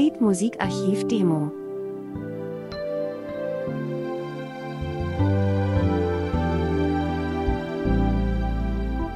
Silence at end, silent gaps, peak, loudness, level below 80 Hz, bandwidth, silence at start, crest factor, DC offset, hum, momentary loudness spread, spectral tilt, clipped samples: 0 s; none; -8 dBFS; -26 LUFS; -34 dBFS; 12 kHz; 0 s; 16 dB; under 0.1%; none; 11 LU; -7 dB/octave; under 0.1%